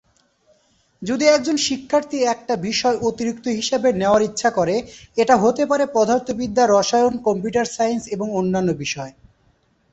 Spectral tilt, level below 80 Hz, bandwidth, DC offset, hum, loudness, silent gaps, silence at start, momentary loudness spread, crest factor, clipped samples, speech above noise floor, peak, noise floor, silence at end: -4 dB/octave; -54 dBFS; 8.2 kHz; under 0.1%; none; -19 LUFS; none; 1 s; 9 LU; 18 dB; under 0.1%; 42 dB; -2 dBFS; -61 dBFS; 0.8 s